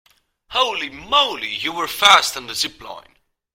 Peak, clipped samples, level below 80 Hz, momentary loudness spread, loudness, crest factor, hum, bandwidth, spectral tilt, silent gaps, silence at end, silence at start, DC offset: 0 dBFS; under 0.1%; -54 dBFS; 14 LU; -17 LUFS; 20 dB; none; 16.5 kHz; 0 dB/octave; none; 0.55 s; 0.5 s; under 0.1%